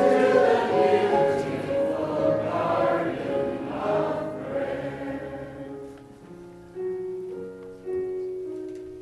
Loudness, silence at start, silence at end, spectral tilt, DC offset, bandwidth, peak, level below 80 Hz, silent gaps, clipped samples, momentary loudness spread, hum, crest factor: -25 LUFS; 0 s; 0 s; -6.5 dB/octave; under 0.1%; 12 kHz; -8 dBFS; -58 dBFS; none; under 0.1%; 18 LU; none; 18 dB